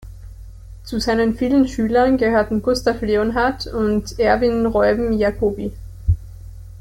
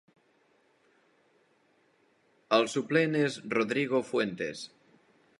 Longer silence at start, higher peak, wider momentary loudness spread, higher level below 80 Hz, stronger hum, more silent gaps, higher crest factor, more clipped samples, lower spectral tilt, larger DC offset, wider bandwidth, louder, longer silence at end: second, 0 s vs 2.5 s; first, -4 dBFS vs -8 dBFS; about the same, 12 LU vs 10 LU; first, -34 dBFS vs -78 dBFS; neither; neither; second, 16 dB vs 24 dB; neither; first, -6.5 dB/octave vs -5 dB/octave; neither; first, 16.5 kHz vs 11.5 kHz; first, -19 LUFS vs -29 LUFS; second, 0 s vs 0.75 s